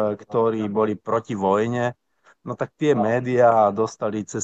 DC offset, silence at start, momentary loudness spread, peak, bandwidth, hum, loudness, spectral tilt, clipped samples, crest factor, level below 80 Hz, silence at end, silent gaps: under 0.1%; 0 s; 11 LU; -6 dBFS; 8.2 kHz; none; -22 LUFS; -6.5 dB/octave; under 0.1%; 16 dB; -68 dBFS; 0 s; none